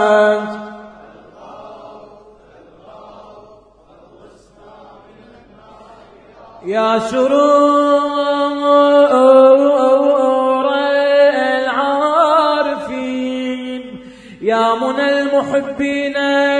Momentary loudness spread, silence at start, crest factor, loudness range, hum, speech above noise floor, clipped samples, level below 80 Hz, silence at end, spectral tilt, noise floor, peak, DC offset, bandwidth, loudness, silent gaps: 15 LU; 0 s; 16 dB; 9 LU; none; 34 dB; under 0.1%; -56 dBFS; 0 s; -4.5 dB/octave; -46 dBFS; 0 dBFS; under 0.1%; 9.8 kHz; -13 LUFS; none